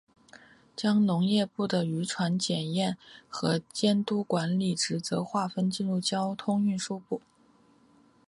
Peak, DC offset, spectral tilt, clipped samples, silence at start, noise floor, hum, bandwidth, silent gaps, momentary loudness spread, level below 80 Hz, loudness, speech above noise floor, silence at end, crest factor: -12 dBFS; under 0.1%; -5 dB/octave; under 0.1%; 0.35 s; -62 dBFS; none; 11.5 kHz; none; 8 LU; -70 dBFS; -29 LUFS; 34 dB; 1.1 s; 18 dB